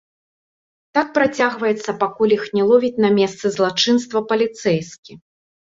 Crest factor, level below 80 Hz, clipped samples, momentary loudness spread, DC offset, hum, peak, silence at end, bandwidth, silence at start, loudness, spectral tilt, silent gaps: 16 dB; -62 dBFS; under 0.1%; 6 LU; under 0.1%; none; -2 dBFS; 0.5 s; 7.8 kHz; 0.95 s; -18 LUFS; -4.5 dB/octave; 4.98-5.03 s